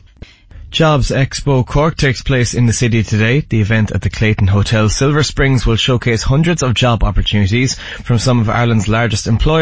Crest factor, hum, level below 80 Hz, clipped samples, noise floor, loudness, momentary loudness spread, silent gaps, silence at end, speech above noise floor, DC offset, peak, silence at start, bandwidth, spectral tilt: 12 dB; none; -24 dBFS; under 0.1%; -38 dBFS; -14 LUFS; 3 LU; none; 0 s; 25 dB; 1%; -2 dBFS; 0.2 s; 8 kHz; -5.5 dB/octave